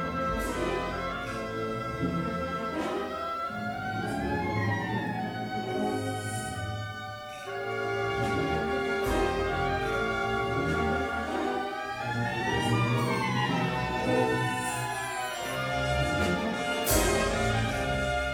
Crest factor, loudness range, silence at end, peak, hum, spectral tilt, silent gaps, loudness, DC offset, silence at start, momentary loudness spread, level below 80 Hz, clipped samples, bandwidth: 18 dB; 4 LU; 0 s; -10 dBFS; none; -5 dB/octave; none; -30 LUFS; under 0.1%; 0 s; 7 LU; -44 dBFS; under 0.1%; over 20 kHz